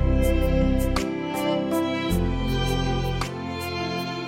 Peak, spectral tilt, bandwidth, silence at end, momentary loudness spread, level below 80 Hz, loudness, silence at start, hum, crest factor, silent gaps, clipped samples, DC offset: -10 dBFS; -6 dB/octave; 16.5 kHz; 0 s; 6 LU; -28 dBFS; -25 LUFS; 0 s; none; 14 dB; none; under 0.1%; under 0.1%